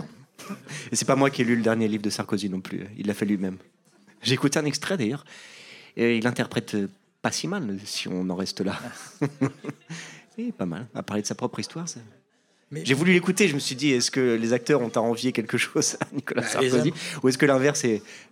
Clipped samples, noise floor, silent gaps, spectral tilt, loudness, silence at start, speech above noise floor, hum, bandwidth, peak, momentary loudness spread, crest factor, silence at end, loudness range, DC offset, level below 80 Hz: under 0.1%; -65 dBFS; none; -4.5 dB/octave; -25 LUFS; 0 s; 40 dB; none; 16.5 kHz; -8 dBFS; 17 LU; 18 dB; 0.1 s; 8 LU; under 0.1%; -72 dBFS